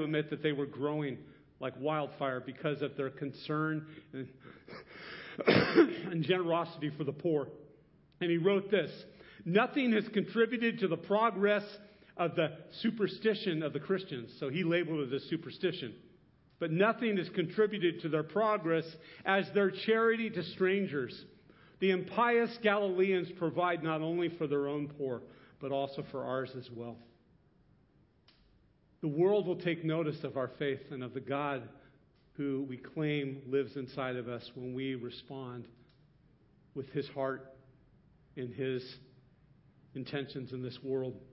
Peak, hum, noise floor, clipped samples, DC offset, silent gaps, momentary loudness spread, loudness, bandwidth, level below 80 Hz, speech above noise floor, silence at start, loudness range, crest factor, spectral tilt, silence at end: -12 dBFS; none; -67 dBFS; under 0.1%; under 0.1%; none; 16 LU; -34 LUFS; 5.6 kHz; -72 dBFS; 34 dB; 0 s; 10 LU; 22 dB; -4.5 dB/octave; 0.1 s